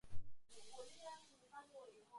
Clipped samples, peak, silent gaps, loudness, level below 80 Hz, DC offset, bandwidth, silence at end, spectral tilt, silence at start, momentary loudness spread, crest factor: under 0.1%; -30 dBFS; none; -59 LUFS; -68 dBFS; under 0.1%; 11.5 kHz; 0 s; -3.5 dB/octave; 0.05 s; 8 LU; 16 dB